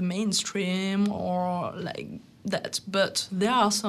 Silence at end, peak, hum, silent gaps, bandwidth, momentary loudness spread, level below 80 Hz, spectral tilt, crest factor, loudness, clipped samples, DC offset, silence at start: 0 s; -10 dBFS; none; none; 13.5 kHz; 11 LU; -66 dBFS; -4 dB/octave; 18 dB; -27 LUFS; under 0.1%; under 0.1%; 0 s